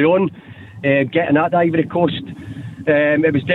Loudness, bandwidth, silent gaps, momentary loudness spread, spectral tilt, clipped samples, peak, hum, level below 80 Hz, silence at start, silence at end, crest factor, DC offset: -17 LUFS; 4.2 kHz; none; 13 LU; -9 dB/octave; under 0.1%; -2 dBFS; none; -54 dBFS; 0 s; 0 s; 14 dB; under 0.1%